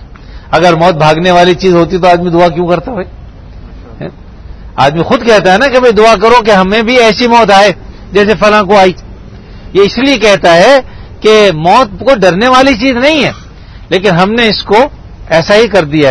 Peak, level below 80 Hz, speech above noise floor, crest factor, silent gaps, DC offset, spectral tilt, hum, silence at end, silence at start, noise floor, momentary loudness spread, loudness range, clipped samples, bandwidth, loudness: 0 dBFS; -30 dBFS; 22 dB; 8 dB; none; under 0.1%; -5 dB/octave; none; 0 s; 0 s; -28 dBFS; 9 LU; 5 LU; 5%; 11 kHz; -7 LUFS